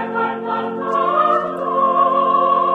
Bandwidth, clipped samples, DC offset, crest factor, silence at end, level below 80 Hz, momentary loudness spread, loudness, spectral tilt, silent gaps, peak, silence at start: 6.6 kHz; under 0.1%; under 0.1%; 14 dB; 0 s; -68 dBFS; 7 LU; -17 LUFS; -7 dB/octave; none; -4 dBFS; 0 s